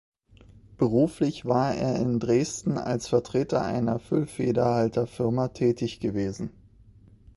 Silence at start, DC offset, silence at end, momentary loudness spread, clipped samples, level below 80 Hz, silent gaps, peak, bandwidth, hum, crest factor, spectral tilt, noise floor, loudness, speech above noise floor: 0.7 s; under 0.1%; 0.85 s; 6 LU; under 0.1%; -54 dBFS; none; -8 dBFS; 11.5 kHz; none; 18 dB; -7 dB/octave; -54 dBFS; -26 LUFS; 28 dB